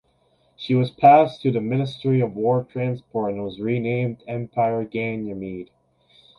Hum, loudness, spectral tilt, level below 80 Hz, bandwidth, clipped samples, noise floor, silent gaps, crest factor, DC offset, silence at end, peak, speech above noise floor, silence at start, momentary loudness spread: none; -22 LUFS; -9 dB/octave; -60 dBFS; 6.2 kHz; under 0.1%; -63 dBFS; none; 20 dB; under 0.1%; 0.75 s; -2 dBFS; 42 dB; 0.6 s; 15 LU